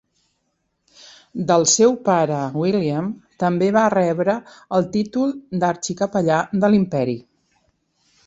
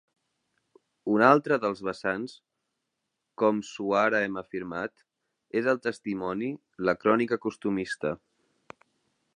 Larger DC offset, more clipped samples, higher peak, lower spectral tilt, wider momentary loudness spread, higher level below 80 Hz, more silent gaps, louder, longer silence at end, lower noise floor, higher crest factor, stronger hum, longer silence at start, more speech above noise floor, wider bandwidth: neither; neither; about the same, -2 dBFS vs -4 dBFS; about the same, -5 dB/octave vs -6 dB/octave; second, 10 LU vs 13 LU; first, -60 dBFS vs -68 dBFS; neither; first, -19 LUFS vs -27 LUFS; second, 1.05 s vs 1.2 s; second, -71 dBFS vs -82 dBFS; second, 18 dB vs 26 dB; neither; first, 1.35 s vs 1.05 s; about the same, 53 dB vs 55 dB; second, 8.2 kHz vs 10.5 kHz